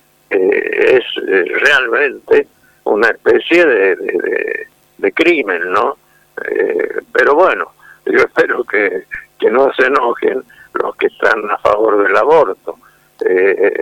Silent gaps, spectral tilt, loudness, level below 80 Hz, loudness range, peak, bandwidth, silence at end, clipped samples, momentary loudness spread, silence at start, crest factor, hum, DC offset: none; -4.5 dB/octave; -13 LUFS; -54 dBFS; 2 LU; 0 dBFS; 14 kHz; 0 s; under 0.1%; 14 LU; 0.3 s; 12 dB; none; under 0.1%